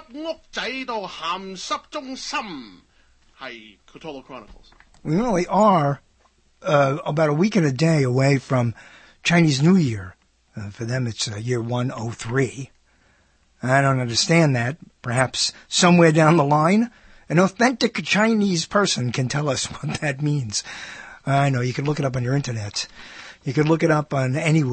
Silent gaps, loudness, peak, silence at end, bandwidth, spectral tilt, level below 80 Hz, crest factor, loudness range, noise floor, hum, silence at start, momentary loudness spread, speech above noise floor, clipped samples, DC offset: none; -21 LUFS; -2 dBFS; 0 s; 8.8 kHz; -5 dB/octave; -54 dBFS; 20 dB; 11 LU; -60 dBFS; none; 0.1 s; 19 LU; 39 dB; under 0.1%; under 0.1%